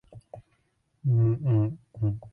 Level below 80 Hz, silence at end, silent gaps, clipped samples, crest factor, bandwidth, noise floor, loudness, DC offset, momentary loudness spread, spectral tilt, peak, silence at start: -54 dBFS; 0.05 s; none; under 0.1%; 12 dB; 3 kHz; -71 dBFS; -27 LUFS; under 0.1%; 8 LU; -12 dB/octave; -14 dBFS; 0.15 s